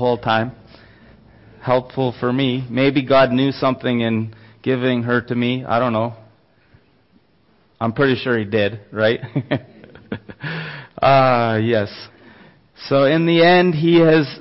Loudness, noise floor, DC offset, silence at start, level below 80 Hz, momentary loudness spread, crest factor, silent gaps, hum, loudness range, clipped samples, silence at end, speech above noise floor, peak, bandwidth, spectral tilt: -18 LUFS; -58 dBFS; under 0.1%; 0 s; -52 dBFS; 15 LU; 14 dB; none; none; 6 LU; under 0.1%; 0 s; 41 dB; -4 dBFS; 5.8 kHz; -10 dB/octave